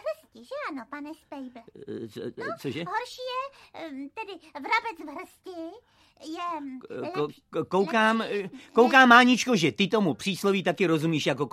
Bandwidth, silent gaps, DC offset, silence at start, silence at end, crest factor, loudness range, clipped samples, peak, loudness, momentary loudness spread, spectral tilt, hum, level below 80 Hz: 14.5 kHz; none; under 0.1%; 0.05 s; 0.05 s; 24 dB; 14 LU; under 0.1%; -2 dBFS; -24 LUFS; 21 LU; -4.5 dB/octave; none; -72 dBFS